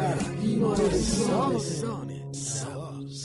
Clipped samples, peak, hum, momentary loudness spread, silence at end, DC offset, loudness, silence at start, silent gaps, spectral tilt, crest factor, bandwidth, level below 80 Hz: under 0.1%; -12 dBFS; none; 12 LU; 0 s; under 0.1%; -28 LUFS; 0 s; none; -5.5 dB/octave; 14 dB; 11.5 kHz; -44 dBFS